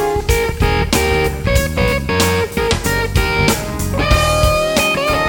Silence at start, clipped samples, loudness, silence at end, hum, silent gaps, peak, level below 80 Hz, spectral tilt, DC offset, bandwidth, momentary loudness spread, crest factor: 0 s; under 0.1%; -15 LUFS; 0 s; none; none; 0 dBFS; -22 dBFS; -4.5 dB/octave; under 0.1%; 17.5 kHz; 3 LU; 14 dB